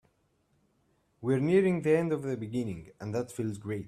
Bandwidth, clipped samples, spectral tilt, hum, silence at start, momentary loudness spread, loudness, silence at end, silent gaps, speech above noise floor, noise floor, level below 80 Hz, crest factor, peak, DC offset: 13.5 kHz; under 0.1%; -7.5 dB/octave; none; 1.2 s; 12 LU; -30 LUFS; 0 s; none; 43 dB; -72 dBFS; -66 dBFS; 18 dB; -14 dBFS; under 0.1%